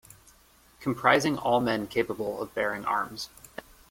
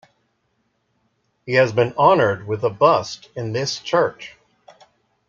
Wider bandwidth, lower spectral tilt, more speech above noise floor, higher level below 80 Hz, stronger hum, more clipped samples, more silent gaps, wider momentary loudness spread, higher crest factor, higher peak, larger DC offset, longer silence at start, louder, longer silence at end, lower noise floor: first, 16.5 kHz vs 7.6 kHz; about the same, -4.5 dB/octave vs -5 dB/octave; second, 32 dB vs 50 dB; about the same, -60 dBFS vs -62 dBFS; neither; neither; neither; about the same, 16 LU vs 16 LU; about the same, 22 dB vs 18 dB; second, -6 dBFS vs -2 dBFS; neither; second, 0.8 s vs 1.45 s; second, -27 LUFS vs -19 LUFS; second, 0.3 s vs 1 s; second, -59 dBFS vs -69 dBFS